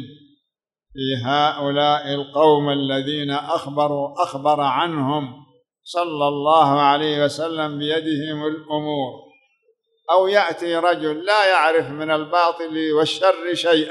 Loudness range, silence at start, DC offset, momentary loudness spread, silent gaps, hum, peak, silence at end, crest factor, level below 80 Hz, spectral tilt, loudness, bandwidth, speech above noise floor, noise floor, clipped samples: 4 LU; 0 s; under 0.1%; 9 LU; none; none; -2 dBFS; 0 s; 18 dB; -66 dBFS; -5.5 dB/octave; -19 LUFS; 12 kHz; 62 dB; -82 dBFS; under 0.1%